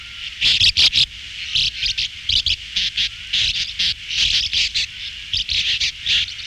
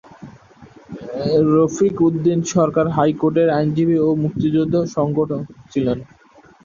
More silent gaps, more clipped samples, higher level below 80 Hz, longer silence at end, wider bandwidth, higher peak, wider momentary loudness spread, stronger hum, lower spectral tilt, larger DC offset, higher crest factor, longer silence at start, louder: neither; neither; first, -40 dBFS vs -50 dBFS; second, 0 s vs 0.6 s; first, 16 kHz vs 7.4 kHz; second, -6 dBFS vs -2 dBFS; about the same, 9 LU vs 10 LU; neither; second, 1 dB/octave vs -7 dB/octave; neither; about the same, 16 dB vs 16 dB; second, 0 s vs 0.2 s; about the same, -17 LUFS vs -18 LUFS